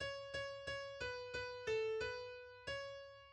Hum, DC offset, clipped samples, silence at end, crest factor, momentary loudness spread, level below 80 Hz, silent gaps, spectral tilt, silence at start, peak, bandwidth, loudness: none; under 0.1%; under 0.1%; 0 s; 16 dB; 11 LU; -66 dBFS; none; -3 dB/octave; 0 s; -30 dBFS; 10 kHz; -45 LUFS